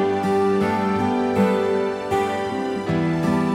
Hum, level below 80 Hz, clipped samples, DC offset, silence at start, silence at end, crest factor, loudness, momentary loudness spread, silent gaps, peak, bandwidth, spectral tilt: none; -52 dBFS; under 0.1%; under 0.1%; 0 s; 0 s; 14 dB; -21 LUFS; 4 LU; none; -6 dBFS; 14 kHz; -7 dB/octave